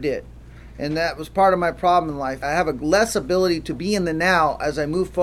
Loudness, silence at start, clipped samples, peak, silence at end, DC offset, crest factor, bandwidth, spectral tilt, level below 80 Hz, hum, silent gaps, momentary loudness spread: -21 LUFS; 0 s; under 0.1%; -4 dBFS; 0 s; under 0.1%; 18 dB; 15 kHz; -5 dB/octave; -42 dBFS; none; none; 9 LU